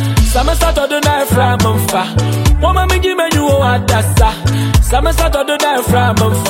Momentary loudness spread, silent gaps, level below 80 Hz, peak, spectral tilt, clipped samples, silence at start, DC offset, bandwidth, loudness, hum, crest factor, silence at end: 2 LU; none; -18 dBFS; 0 dBFS; -5 dB/octave; under 0.1%; 0 s; under 0.1%; 16.5 kHz; -12 LUFS; none; 12 dB; 0 s